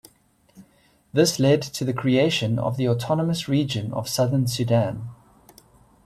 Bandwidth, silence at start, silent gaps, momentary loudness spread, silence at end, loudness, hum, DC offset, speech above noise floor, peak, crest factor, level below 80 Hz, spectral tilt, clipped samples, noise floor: 14.5 kHz; 0.55 s; none; 7 LU; 0.9 s; -22 LUFS; none; under 0.1%; 38 dB; -6 dBFS; 18 dB; -56 dBFS; -5.5 dB/octave; under 0.1%; -60 dBFS